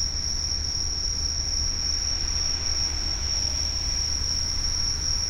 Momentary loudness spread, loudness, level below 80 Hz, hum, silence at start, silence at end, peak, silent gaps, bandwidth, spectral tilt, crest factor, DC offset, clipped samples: 1 LU; -24 LUFS; -32 dBFS; none; 0 s; 0 s; -14 dBFS; none; 16 kHz; -1 dB/octave; 12 dB; under 0.1%; under 0.1%